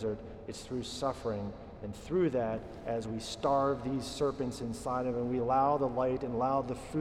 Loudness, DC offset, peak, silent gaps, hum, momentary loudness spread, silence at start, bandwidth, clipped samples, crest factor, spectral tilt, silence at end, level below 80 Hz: -33 LUFS; under 0.1%; -18 dBFS; none; none; 11 LU; 0 s; 14.5 kHz; under 0.1%; 16 dB; -6 dB/octave; 0 s; -54 dBFS